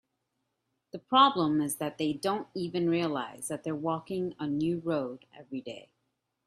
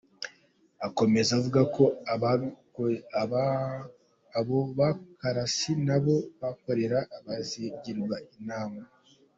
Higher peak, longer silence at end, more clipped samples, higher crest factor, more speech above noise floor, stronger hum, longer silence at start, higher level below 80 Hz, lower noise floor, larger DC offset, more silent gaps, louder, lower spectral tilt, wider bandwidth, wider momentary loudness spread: about the same, -8 dBFS vs -8 dBFS; first, 0.65 s vs 0.5 s; neither; about the same, 22 dB vs 20 dB; first, 51 dB vs 36 dB; neither; first, 0.95 s vs 0.2 s; second, -72 dBFS vs -64 dBFS; first, -81 dBFS vs -64 dBFS; neither; neither; about the same, -30 LUFS vs -29 LUFS; about the same, -5 dB/octave vs -6 dB/octave; first, 15 kHz vs 8 kHz; first, 18 LU vs 13 LU